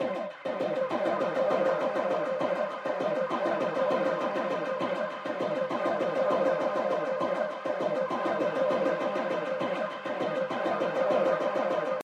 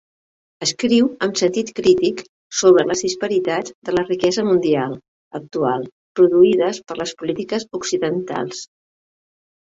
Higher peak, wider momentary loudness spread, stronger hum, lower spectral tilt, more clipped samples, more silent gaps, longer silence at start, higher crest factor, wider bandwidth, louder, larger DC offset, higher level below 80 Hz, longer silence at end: second, -14 dBFS vs -2 dBFS; second, 5 LU vs 14 LU; neither; first, -6 dB/octave vs -4.5 dB/octave; neither; second, none vs 2.29-2.50 s, 3.75-3.82 s, 5.08-5.31 s, 5.92-6.15 s; second, 0 s vs 0.6 s; about the same, 14 dB vs 16 dB; first, 9.4 kHz vs 8 kHz; second, -29 LUFS vs -19 LUFS; neither; second, -82 dBFS vs -58 dBFS; second, 0 s vs 1.05 s